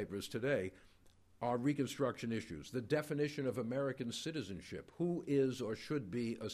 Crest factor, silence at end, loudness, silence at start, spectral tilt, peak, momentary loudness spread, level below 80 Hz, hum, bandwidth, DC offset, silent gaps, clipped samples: 16 dB; 0 s; -39 LUFS; 0 s; -6 dB/octave; -22 dBFS; 9 LU; -70 dBFS; none; 15 kHz; under 0.1%; none; under 0.1%